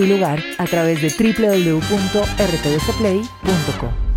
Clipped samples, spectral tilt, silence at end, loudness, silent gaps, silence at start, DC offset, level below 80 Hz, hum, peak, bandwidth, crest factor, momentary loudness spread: under 0.1%; -5.5 dB/octave; 0 s; -18 LUFS; none; 0 s; under 0.1%; -30 dBFS; none; -4 dBFS; 16 kHz; 14 dB; 5 LU